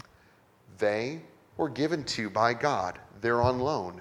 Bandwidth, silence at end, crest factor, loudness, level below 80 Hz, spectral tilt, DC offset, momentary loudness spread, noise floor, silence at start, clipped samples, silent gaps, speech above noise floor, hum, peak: 13.5 kHz; 0 s; 20 dB; -29 LUFS; -58 dBFS; -5.5 dB/octave; under 0.1%; 10 LU; -61 dBFS; 0.7 s; under 0.1%; none; 32 dB; none; -10 dBFS